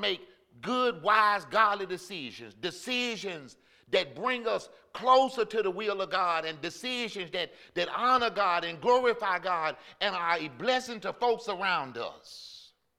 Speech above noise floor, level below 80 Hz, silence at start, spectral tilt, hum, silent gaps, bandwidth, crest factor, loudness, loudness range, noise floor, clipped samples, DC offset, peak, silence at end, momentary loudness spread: 24 dB; -72 dBFS; 0 s; -3.5 dB/octave; none; none; 14.5 kHz; 22 dB; -29 LUFS; 3 LU; -54 dBFS; under 0.1%; under 0.1%; -8 dBFS; 0.35 s; 14 LU